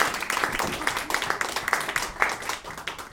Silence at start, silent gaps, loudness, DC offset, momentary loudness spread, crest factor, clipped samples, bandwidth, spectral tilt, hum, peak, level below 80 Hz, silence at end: 0 s; none; -27 LUFS; under 0.1%; 7 LU; 26 dB; under 0.1%; 17.5 kHz; -1.5 dB/octave; none; -2 dBFS; -50 dBFS; 0 s